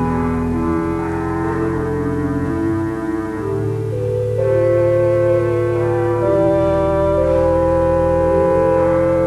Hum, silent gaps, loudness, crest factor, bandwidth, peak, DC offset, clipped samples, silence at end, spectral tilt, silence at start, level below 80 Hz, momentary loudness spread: none; none; -17 LUFS; 12 dB; 12 kHz; -4 dBFS; under 0.1%; under 0.1%; 0 s; -9 dB/octave; 0 s; -34 dBFS; 6 LU